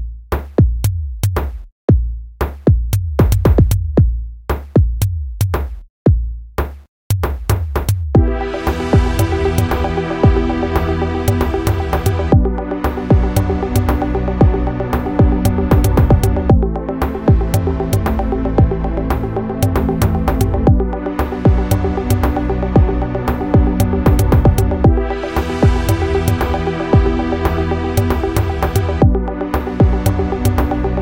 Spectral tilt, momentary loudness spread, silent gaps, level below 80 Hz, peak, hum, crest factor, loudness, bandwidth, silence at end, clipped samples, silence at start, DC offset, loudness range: -7.5 dB/octave; 7 LU; 1.72-1.88 s, 5.90-6.05 s, 6.89-7.10 s; -20 dBFS; 0 dBFS; none; 14 dB; -16 LUFS; 17 kHz; 0 s; under 0.1%; 0 s; under 0.1%; 3 LU